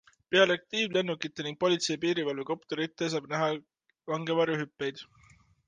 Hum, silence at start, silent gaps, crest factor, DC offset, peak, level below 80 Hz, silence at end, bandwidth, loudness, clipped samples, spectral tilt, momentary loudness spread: none; 0.3 s; none; 20 dB; under 0.1%; -10 dBFS; -74 dBFS; 0.65 s; 9.8 kHz; -30 LUFS; under 0.1%; -4 dB/octave; 11 LU